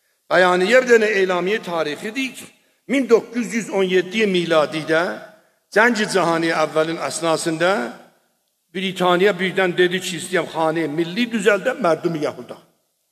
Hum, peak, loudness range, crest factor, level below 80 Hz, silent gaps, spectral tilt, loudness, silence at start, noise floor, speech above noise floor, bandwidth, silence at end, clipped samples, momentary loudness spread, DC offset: none; 0 dBFS; 2 LU; 18 dB; -72 dBFS; none; -4.5 dB/octave; -19 LUFS; 0.3 s; -67 dBFS; 48 dB; 14.5 kHz; 0.55 s; under 0.1%; 10 LU; under 0.1%